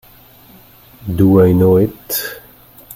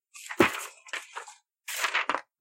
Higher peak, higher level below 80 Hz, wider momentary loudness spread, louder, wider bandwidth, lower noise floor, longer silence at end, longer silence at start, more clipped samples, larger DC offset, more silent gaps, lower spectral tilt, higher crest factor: first, 0 dBFS vs -8 dBFS; first, -44 dBFS vs -64 dBFS; about the same, 19 LU vs 18 LU; first, -13 LUFS vs -29 LUFS; about the same, 17 kHz vs 16.5 kHz; second, -44 dBFS vs -49 dBFS; second, 0 s vs 0.2 s; first, 1.05 s vs 0.15 s; neither; neither; neither; first, -7 dB/octave vs -2.5 dB/octave; second, 16 dB vs 24 dB